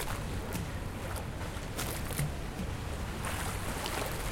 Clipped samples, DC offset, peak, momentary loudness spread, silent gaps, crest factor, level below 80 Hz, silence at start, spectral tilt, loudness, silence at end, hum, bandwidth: under 0.1%; under 0.1%; -18 dBFS; 4 LU; none; 18 dB; -42 dBFS; 0 s; -4.5 dB/octave; -37 LUFS; 0 s; none; 17 kHz